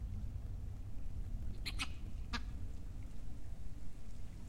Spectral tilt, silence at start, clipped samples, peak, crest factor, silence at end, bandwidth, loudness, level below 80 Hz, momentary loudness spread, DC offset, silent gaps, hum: -4.5 dB/octave; 0 s; under 0.1%; -24 dBFS; 16 dB; 0 s; 13 kHz; -48 LUFS; -46 dBFS; 9 LU; under 0.1%; none; none